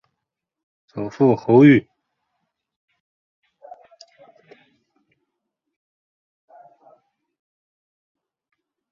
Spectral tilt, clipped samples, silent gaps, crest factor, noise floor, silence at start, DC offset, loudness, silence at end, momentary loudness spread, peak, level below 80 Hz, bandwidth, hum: -9 dB/octave; under 0.1%; none; 22 dB; -82 dBFS; 0.95 s; under 0.1%; -15 LUFS; 7.1 s; 20 LU; -2 dBFS; -64 dBFS; 6.8 kHz; none